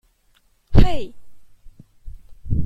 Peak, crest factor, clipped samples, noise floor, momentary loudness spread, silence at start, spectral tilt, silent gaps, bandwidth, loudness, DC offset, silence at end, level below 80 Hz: 0 dBFS; 18 dB; under 0.1%; -60 dBFS; 27 LU; 0.7 s; -8 dB/octave; none; 7.6 kHz; -21 LUFS; under 0.1%; 0 s; -26 dBFS